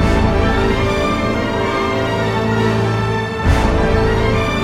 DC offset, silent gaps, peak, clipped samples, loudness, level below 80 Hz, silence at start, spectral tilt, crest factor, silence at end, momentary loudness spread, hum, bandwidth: under 0.1%; none; -2 dBFS; under 0.1%; -16 LUFS; -22 dBFS; 0 s; -6.5 dB/octave; 14 dB; 0 s; 3 LU; none; 14 kHz